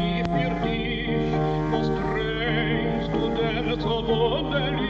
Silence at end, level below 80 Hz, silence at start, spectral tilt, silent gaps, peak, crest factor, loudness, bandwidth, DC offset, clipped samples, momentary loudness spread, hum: 0 s; -36 dBFS; 0 s; -7.5 dB/octave; none; -8 dBFS; 16 dB; -25 LUFS; 7.4 kHz; under 0.1%; under 0.1%; 3 LU; none